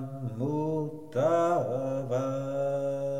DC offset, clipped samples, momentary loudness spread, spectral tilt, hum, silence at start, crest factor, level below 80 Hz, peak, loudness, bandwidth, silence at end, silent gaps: 0.3%; under 0.1%; 8 LU; -8 dB/octave; none; 0 s; 14 dB; -70 dBFS; -16 dBFS; -30 LUFS; 15 kHz; 0 s; none